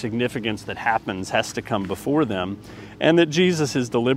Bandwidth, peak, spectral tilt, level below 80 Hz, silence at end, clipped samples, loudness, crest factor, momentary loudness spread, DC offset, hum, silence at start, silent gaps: 16 kHz; -2 dBFS; -5 dB/octave; -54 dBFS; 0 s; under 0.1%; -22 LUFS; 20 dB; 10 LU; under 0.1%; none; 0 s; none